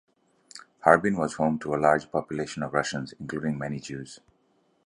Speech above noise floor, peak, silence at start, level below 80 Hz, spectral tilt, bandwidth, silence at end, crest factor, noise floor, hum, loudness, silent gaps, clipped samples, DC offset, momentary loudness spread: 42 dB; -2 dBFS; 0.55 s; -60 dBFS; -5.5 dB/octave; 11 kHz; 0.7 s; 26 dB; -68 dBFS; none; -26 LUFS; none; under 0.1%; under 0.1%; 19 LU